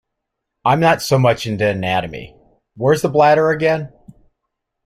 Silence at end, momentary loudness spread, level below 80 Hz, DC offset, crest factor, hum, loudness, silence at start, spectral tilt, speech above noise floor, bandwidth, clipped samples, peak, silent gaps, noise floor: 1 s; 10 LU; -52 dBFS; under 0.1%; 16 dB; none; -16 LUFS; 0.65 s; -6 dB/octave; 62 dB; 16 kHz; under 0.1%; -2 dBFS; none; -78 dBFS